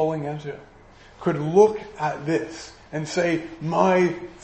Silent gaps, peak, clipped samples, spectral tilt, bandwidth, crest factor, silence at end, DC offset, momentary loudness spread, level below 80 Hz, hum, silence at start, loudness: none; -4 dBFS; under 0.1%; -6.5 dB/octave; 8.6 kHz; 20 dB; 0 s; under 0.1%; 17 LU; -56 dBFS; none; 0 s; -23 LUFS